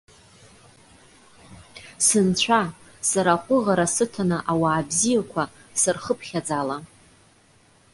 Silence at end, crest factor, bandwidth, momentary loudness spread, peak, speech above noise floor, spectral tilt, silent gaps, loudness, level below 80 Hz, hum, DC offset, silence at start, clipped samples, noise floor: 1.1 s; 20 dB; 11.5 kHz; 10 LU; -4 dBFS; 35 dB; -3.5 dB/octave; none; -22 LUFS; -58 dBFS; none; under 0.1%; 1.5 s; under 0.1%; -57 dBFS